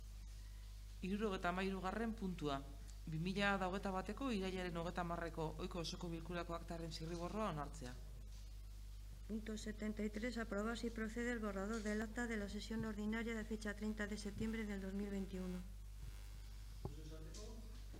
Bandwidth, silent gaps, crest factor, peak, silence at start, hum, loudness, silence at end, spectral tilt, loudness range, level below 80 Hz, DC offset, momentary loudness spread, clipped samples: 16 kHz; none; 22 dB; -24 dBFS; 0 s; 50 Hz at -55 dBFS; -45 LUFS; 0 s; -5.5 dB/octave; 6 LU; -54 dBFS; under 0.1%; 14 LU; under 0.1%